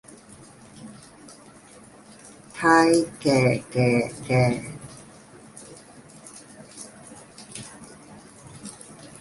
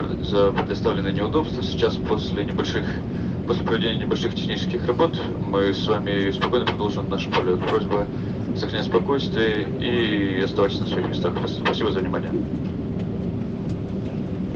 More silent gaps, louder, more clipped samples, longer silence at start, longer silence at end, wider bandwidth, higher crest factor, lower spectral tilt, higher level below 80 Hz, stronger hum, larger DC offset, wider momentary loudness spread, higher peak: neither; about the same, -21 LUFS vs -23 LUFS; neither; first, 0.8 s vs 0 s; first, 0.15 s vs 0 s; first, 11.5 kHz vs 7.2 kHz; first, 22 dB vs 16 dB; second, -5.5 dB/octave vs -7 dB/octave; second, -58 dBFS vs -40 dBFS; neither; neither; first, 26 LU vs 6 LU; about the same, -4 dBFS vs -6 dBFS